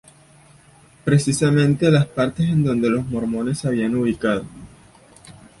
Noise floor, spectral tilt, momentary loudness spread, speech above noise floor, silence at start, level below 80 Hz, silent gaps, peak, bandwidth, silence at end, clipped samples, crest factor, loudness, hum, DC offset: -50 dBFS; -6.5 dB/octave; 7 LU; 32 dB; 1.05 s; -50 dBFS; none; -4 dBFS; 11.5 kHz; 0.3 s; under 0.1%; 16 dB; -20 LUFS; none; under 0.1%